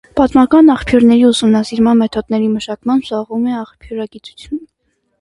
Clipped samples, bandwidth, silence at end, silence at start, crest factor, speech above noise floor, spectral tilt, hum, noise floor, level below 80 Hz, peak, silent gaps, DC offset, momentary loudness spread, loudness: under 0.1%; 11.5 kHz; 0.55 s; 0.15 s; 12 dB; 53 dB; -5.5 dB/octave; none; -65 dBFS; -40 dBFS; 0 dBFS; none; under 0.1%; 18 LU; -12 LUFS